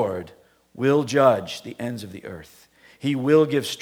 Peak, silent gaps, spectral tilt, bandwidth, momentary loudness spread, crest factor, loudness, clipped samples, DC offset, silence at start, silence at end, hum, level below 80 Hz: -4 dBFS; none; -6 dB/octave; 17.5 kHz; 18 LU; 18 dB; -21 LUFS; under 0.1%; under 0.1%; 0 s; 0 s; none; -64 dBFS